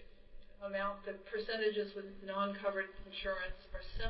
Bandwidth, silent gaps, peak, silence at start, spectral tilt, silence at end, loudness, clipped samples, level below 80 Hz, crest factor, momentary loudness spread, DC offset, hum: 5.6 kHz; none; -24 dBFS; 0 s; -2 dB/octave; 0 s; -40 LUFS; under 0.1%; -52 dBFS; 16 dB; 11 LU; under 0.1%; none